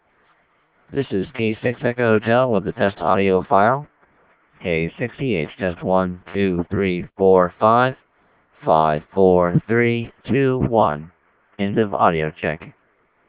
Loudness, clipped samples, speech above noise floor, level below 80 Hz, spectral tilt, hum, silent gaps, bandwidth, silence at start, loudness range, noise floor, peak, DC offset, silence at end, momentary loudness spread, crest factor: -19 LUFS; under 0.1%; 43 dB; -46 dBFS; -11 dB/octave; none; none; 4 kHz; 0.9 s; 4 LU; -62 dBFS; -2 dBFS; under 0.1%; 0.6 s; 10 LU; 18 dB